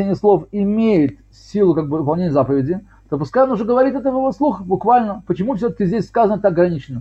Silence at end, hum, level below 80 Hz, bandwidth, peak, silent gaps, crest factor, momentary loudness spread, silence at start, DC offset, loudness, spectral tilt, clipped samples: 0 s; none; -46 dBFS; 8 kHz; -2 dBFS; none; 14 dB; 6 LU; 0 s; under 0.1%; -17 LUFS; -9.5 dB/octave; under 0.1%